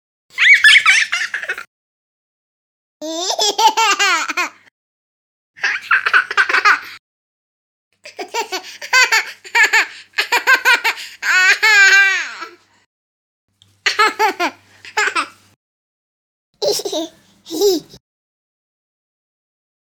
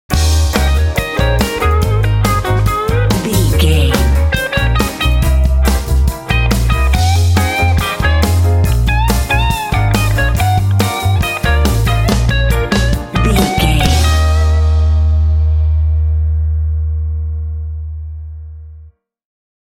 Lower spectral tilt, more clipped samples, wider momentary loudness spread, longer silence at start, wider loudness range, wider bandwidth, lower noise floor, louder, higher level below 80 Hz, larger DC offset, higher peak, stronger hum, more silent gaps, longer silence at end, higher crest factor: second, 1 dB/octave vs -5.5 dB/octave; neither; first, 17 LU vs 5 LU; first, 0.35 s vs 0.1 s; first, 10 LU vs 3 LU; first, over 20 kHz vs 17 kHz; second, -35 dBFS vs -40 dBFS; about the same, -13 LUFS vs -13 LUFS; second, -68 dBFS vs -16 dBFS; neither; about the same, 0 dBFS vs 0 dBFS; neither; first, 1.67-3.00 s, 4.71-5.54 s, 6.99-7.91 s, 12.86-13.48 s, 15.56-16.53 s vs none; first, 2.1 s vs 0.85 s; first, 18 dB vs 12 dB